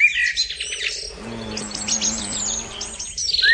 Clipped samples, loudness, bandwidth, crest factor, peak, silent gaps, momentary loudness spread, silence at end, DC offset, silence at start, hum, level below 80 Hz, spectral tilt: under 0.1%; -22 LUFS; 10 kHz; 18 dB; -6 dBFS; none; 11 LU; 0 s; under 0.1%; 0 s; none; -46 dBFS; 0 dB/octave